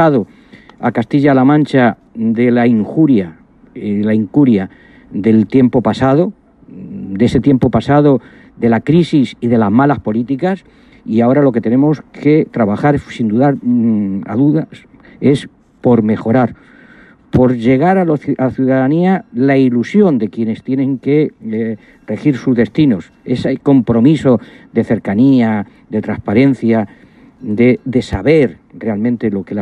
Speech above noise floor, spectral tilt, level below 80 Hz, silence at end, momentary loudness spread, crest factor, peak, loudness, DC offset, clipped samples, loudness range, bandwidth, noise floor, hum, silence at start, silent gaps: 30 dB; -9 dB/octave; -44 dBFS; 0 s; 9 LU; 12 dB; 0 dBFS; -13 LUFS; under 0.1%; under 0.1%; 2 LU; 8.8 kHz; -42 dBFS; none; 0 s; none